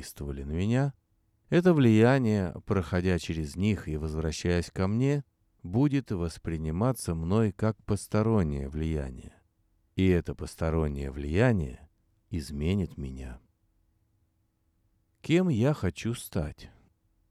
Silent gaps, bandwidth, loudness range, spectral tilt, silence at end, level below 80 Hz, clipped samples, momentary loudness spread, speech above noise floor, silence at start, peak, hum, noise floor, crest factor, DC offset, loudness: none; 14 kHz; 6 LU; -7 dB/octave; 0.65 s; -44 dBFS; under 0.1%; 14 LU; 45 dB; 0 s; -8 dBFS; none; -73 dBFS; 20 dB; under 0.1%; -28 LUFS